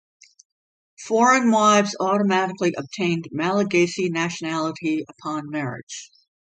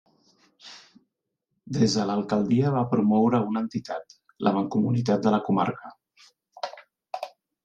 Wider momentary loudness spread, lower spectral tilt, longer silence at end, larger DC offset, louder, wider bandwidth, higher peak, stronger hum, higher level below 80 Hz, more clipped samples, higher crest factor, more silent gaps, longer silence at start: second, 14 LU vs 17 LU; second, -4.5 dB/octave vs -7 dB/octave; first, 0.5 s vs 0.35 s; neither; first, -21 LUFS vs -25 LUFS; about the same, 9.4 kHz vs 8.6 kHz; about the same, -6 dBFS vs -8 dBFS; neither; about the same, -68 dBFS vs -66 dBFS; neither; about the same, 18 dB vs 18 dB; first, 5.83-5.87 s vs none; first, 1 s vs 0.65 s